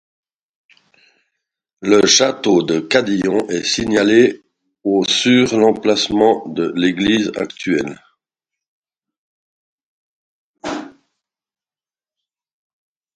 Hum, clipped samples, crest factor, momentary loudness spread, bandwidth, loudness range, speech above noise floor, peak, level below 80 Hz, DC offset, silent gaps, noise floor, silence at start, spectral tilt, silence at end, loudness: none; under 0.1%; 18 dB; 14 LU; 11 kHz; 21 LU; over 75 dB; 0 dBFS; -52 dBFS; under 0.1%; 8.68-8.83 s, 9.17-9.78 s, 9.85-10.54 s; under -90 dBFS; 1.8 s; -3.5 dB/octave; 2.25 s; -15 LUFS